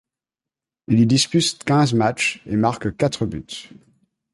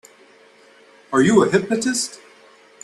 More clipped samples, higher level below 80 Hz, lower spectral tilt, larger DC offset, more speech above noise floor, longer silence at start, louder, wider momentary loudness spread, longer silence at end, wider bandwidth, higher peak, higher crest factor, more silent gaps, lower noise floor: neither; first, -50 dBFS vs -60 dBFS; about the same, -5 dB/octave vs -4.5 dB/octave; neither; first, 69 dB vs 33 dB; second, 0.9 s vs 1.1 s; about the same, -19 LUFS vs -18 LUFS; about the same, 11 LU vs 9 LU; about the same, 0.7 s vs 0.7 s; about the same, 11.5 kHz vs 12.5 kHz; about the same, -4 dBFS vs -2 dBFS; about the same, 16 dB vs 20 dB; neither; first, -89 dBFS vs -50 dBFS